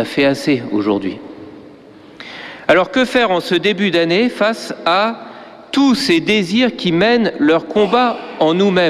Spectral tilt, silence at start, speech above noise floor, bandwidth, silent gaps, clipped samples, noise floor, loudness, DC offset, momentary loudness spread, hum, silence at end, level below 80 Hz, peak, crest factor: -5 dB/octave; 0 s; 26 dB; 14 kHz; none; under 0.1%; -40 dBFS; -15 LUFS; under 0.1%; 17 LU; none; 0 s; -52 dBFS; -2 dBFS; 14 dB